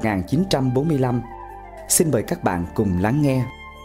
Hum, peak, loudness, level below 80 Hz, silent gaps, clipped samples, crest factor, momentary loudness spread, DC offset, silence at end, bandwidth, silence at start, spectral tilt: none; -4 dBFS; -21 LUFS; -42 dBFS; none; under 0.1%; 18 dB; 16 LU; under 0.1%; 0 s; 16 kHz; 0 s; -5.5 dB/octave